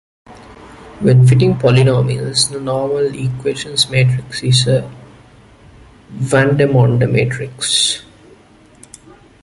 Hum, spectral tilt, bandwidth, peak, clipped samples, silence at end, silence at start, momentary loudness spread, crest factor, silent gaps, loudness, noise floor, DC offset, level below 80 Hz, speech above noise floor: none; -5 dB/octave; 11.5 kHz; 0 dBFS; under 0.1%; 1.4 s; 0.3 s; 9 LU; 14 dB; none; -14 LUFS; -45 dBFS; under 0.1%; -44 dBFS; 32 dB